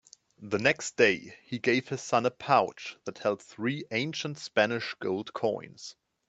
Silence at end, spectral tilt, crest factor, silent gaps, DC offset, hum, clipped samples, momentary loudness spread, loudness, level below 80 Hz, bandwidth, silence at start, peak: 0.35 s; -4.5 dB/octave; 22 dB; none; under 0.1%; none; under 0.1%; 15 LU; -29 LUFS; -72 dBFS; 8.6 kHz; 0.4 s; -8 dBFS